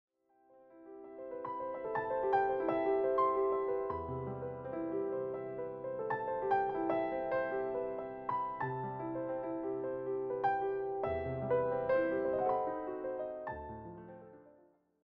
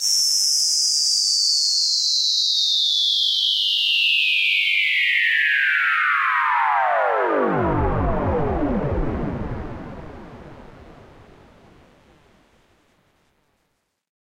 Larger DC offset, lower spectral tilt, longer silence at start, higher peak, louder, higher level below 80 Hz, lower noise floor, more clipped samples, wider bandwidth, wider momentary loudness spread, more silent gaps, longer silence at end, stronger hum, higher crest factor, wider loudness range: neither; first, -6 dB/octave vs -1.5 dB/octave; first, 0.55 s vs 0 s; second, -20 dBFS vs -6 dBFS; second, -36 LUFS vs -17 LUFS; second, -64 dBFS vs -36 dBFS; second, -68 dBFS vs -72 dBFS; neither; second, 5.2 kHz vs 16 kHz; about the same, 11 LU vs 9 LU; neither; second, 0.55 s vs 3.35 s; neither; about the same, 16 dB vs 14 dB; second, 3 LU vs 12 LU